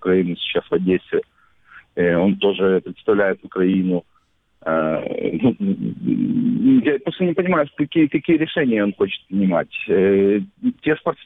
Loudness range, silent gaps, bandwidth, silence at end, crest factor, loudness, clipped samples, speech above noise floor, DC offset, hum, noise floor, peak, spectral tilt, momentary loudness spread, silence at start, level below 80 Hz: 3 LU; none; 4 kHz; 0.1 s; 14 dB; -19 LUFS; under 0.1%; 30 dB; under 0.1%; none; -48 dBFS; -6 dBFS; -10 dB/octave; 7 LU; 0 s; -56 dBFS